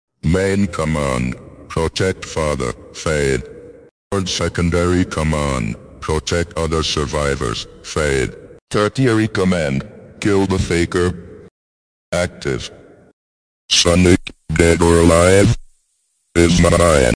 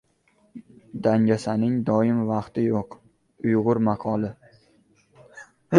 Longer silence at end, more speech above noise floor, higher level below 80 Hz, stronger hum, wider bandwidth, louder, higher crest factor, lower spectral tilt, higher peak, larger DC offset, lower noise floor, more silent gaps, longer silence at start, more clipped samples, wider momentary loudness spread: about the same, 0 s vs 0 s; first, 49 dB vs 42 dB; first, -32 dBFS vs -60 dBFS; neither; about the same, 10.5 kHz vs 10 kHz; first, -17 LUFS vs -24 LUFS; second, 18 dB vs 24 dB; second, -5 dB/octave vs -8.5 dB/octave; about the same, 0 dBFS vs -2 dBFS; neither; about the same, -65 dBFS vs -64 dBFS; first, 3.91-4.10 s, 8.61-8.67 s, 11.51-12.12 s, 13.13-13.69 s vs none; second, 0.25 s vs 0.55 s; neither; first, 13 LU vs 10 LU